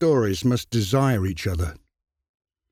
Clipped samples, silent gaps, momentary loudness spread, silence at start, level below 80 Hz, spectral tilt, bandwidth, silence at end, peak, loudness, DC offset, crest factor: under 0.1%; none; 7 LU; 0 s; -40 dBFS; -6.5 dB/octave; 16 kHz; 0.95 s; -10 dBFS; -23 LUFS; under 0.1%; 14 dB